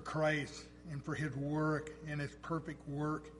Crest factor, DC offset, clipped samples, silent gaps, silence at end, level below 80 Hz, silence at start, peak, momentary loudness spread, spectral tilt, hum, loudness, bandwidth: 18 dB; under 0.1%; under 0.1%; none; 0 s; -60 dBFS; 0 s; -22 dBFS; 11 LU; -6.5 dB/octave; none; -39 LUFS; 11.5 kHz